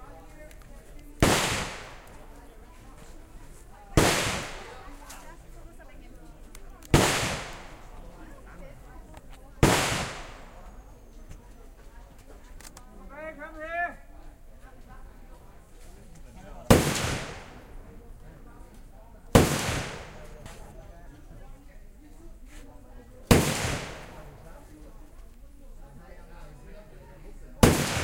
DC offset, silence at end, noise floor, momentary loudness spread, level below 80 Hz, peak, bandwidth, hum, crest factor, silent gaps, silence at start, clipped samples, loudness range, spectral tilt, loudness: under 0.1%; 0 s; -48 dBFS; 28 LU; -40 dBFS; -2 dBFS; 16 kHz; none; 30 dB; none; 0 s; under 0.1%; 12 LU; -4.5 dB/octave; -25 LUFS